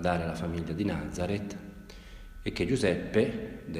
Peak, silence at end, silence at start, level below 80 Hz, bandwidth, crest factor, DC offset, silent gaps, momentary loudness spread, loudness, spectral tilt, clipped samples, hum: -14 dBFS; 0 s; 0 s; -48 dBFS; 15.5 kHz; 18 dB; under 0.1%; none; 20 LU; -31 LUFS; -6.5 dB/octave; under 0.1%; none